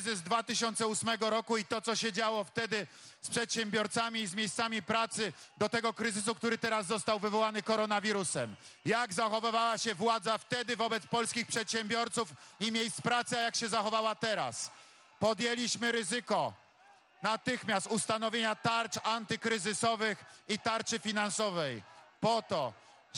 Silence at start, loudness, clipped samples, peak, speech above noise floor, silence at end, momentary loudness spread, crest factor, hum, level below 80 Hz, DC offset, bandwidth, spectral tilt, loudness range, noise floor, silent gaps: 0 s; -33 LUFS; under 0.1%; -16 dBFS; 29 dB; 0 s; 6 LU; 18 dB; none; -78 dBFS; under 0.1%; 13.5 kHz; -2.5 dB/octave; 2 LU; -63 dBFS; none